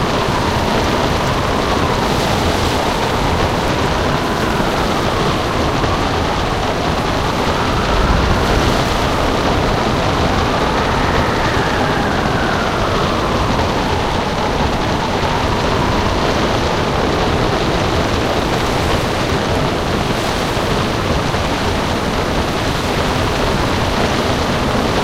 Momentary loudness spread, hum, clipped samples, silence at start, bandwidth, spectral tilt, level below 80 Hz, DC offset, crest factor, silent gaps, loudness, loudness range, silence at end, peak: 2 LU; none; under 0.1%; 0 s; 16 kHz; -5 dB/octave; -26 dBFS; 0.2%; 14 dB; none; -16 LUFS; 1 LU; 0 s; 0 dBFS